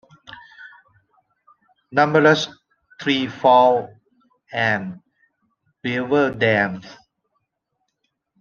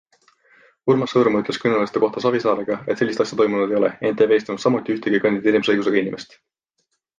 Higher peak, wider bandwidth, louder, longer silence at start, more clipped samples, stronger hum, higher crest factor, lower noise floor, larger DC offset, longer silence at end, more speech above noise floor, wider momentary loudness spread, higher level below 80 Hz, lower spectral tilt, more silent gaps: about the same, -2 dBFS vs -4 dBFS; second, 7.2 kHz vs 9.2 kHz; about the same, -19 LUFS vs -20 LUFS; second, 0.3 s vs 0.85 s; neither; neither; about the same, 20 dB vs 16 dB; about the same, -75 dBFS vs -73 dBFS; neither; first, 1.5 s vs 0.95 s; first, 58 dB vs 53 dB; first, 21 LU vs 4 LU; about the same, -64 dBFS vs -64 dBFS; about the same, -5.5 dB/octave vs -6 dB/octave; neither